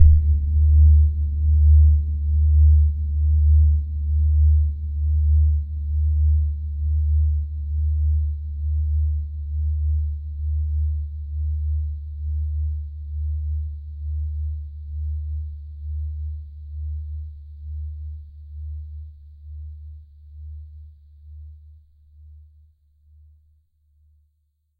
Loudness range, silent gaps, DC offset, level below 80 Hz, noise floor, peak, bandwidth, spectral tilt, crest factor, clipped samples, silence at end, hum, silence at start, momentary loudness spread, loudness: 20 LU; none; under 0.1%; -22 dBFS; -69 dBFS; 0 dBFS; 0.4 kHz; -13 dB/octave; 20 dB; under 0.1%; 2.4 s; none; 0 s; 22 LU; -22 LUFS